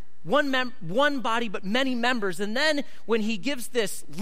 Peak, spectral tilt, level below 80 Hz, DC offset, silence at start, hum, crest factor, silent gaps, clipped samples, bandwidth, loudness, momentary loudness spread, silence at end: -10 dBFS; -3.5 dB/octave; -68 dBFS; 4%; 0.25 s; none; 16 dB; none; under 0.1%; 16 kHz; -26 LUFS; 5 LU; 0 s